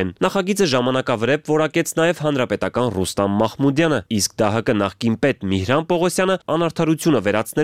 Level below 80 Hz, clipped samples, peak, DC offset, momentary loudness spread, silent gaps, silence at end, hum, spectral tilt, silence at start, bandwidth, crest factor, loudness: -52 dBFS; under 0.1%; -2 dBFS; 0.3%; 3 LU; none; 0 s; none; -5 dB/octave; 0 s; 16 kHz; 16 dB; -19 LUFS